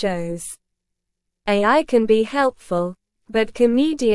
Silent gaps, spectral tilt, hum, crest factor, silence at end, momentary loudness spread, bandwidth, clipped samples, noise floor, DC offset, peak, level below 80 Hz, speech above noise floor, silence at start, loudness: none; -5 dB/octave; none; 16 dB; 0 s; 14 LU; 12 kHz; under 0.1%; -79 dBFS; under 0.1%; -4 dBFS; -50 dBFS; 60 dB; 0 s; -19 LUFS